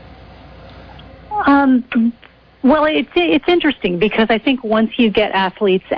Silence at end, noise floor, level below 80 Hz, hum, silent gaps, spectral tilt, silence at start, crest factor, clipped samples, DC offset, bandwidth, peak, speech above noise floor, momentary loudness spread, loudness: 0 s; -39 dBFS; -44 dBFS; none; none; -8 dB/octave; 0.1 s; 14 dB; under 0.1%; under 0.1%; 5.4 kHz; -2 dBFS; 24 dB; 5 LU; -15 LUFS